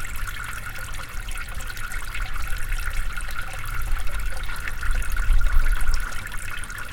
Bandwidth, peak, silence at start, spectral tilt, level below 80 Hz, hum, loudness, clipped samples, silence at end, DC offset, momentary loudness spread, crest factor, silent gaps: 17 kHz; -6 dBFS; 0 s; -3 dB/octave; -24 dBFS; none; -30 LUFS; under 0.1%; 0 s; under 0.1%; 8 LU; 16 dB; none